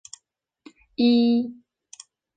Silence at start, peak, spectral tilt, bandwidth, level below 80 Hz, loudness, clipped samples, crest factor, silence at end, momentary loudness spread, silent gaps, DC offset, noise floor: 1 s; -8 dBFS; -5 dB/octave; 9 kHz; -70 dBFS; -21 LUFS; under 0.1%; 16 dB; 0.85 s; 20 LU; none; under 0.1%; -70 dBFS